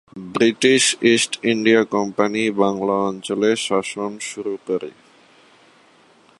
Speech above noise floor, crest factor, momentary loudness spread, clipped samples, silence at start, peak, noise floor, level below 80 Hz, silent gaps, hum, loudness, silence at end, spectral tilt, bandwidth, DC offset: 34 dB; 20 dB; 12 LU; under 0.1%; 0.15 s; -2 dBFS; -53 dBFS; -64 dBFS; none; none; -19 LUFS; 1.5 s; -3.5 dB/octave; 11.5 kHz; under 0.1%